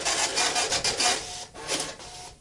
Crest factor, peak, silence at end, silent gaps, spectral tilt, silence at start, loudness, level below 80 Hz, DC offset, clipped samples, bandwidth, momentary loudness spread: 18 dB; -10 dBFS; 0.05 s; none; 0 dB/octave; 0 s; -25 LUFS; -54 dBFS; under 0.1%; under 0.1%; 11.5 kHz; 14 LU